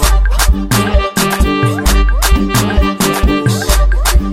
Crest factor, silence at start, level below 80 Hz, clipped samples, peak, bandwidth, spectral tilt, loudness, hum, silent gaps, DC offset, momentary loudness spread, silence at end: 10 dB; 0 s; -12 dBFS; under 0.1%; 0 dBFS; 16.5 kHz; -4.5 dB/octave; -13 LUFS; none; none; under 0.1%; 1 LU; 0 s